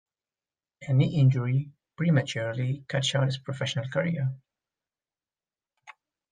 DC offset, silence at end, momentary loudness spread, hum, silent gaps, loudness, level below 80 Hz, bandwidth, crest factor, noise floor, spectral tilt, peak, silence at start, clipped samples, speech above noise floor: under 0.1%; 0.4 s; 9 LU; none; none; -27 LUFS; -66 dBFS; 9.4 kHz; 16 dB; under -90 dBFS; -6 dB/octave; -12 dBFS; 0.8 s; under 0.1%; over 64 dB